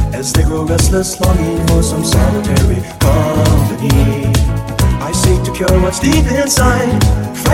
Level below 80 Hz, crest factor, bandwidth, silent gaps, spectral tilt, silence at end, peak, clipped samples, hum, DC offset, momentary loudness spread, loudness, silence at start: -18 dBFS; 12 dB; 16.5 kHz; none; -5.5 dB/octave; 0 s; 0 dBFS; under 0.1%; none; under 0.1%; 3 LU; -13 LUFS; 0 s